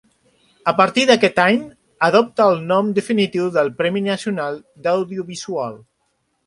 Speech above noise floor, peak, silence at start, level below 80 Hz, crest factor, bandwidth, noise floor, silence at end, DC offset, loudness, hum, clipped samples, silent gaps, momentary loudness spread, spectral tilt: 51 dB; 0 dBFS; 0.65 s; -62 dBFS; 18 dB; 11.5 kHz; -68 dBFS; 0.7 s; under 0.1%; -18 LUFS; none; under 0.1%; none; 12 LU; -5 dB/octave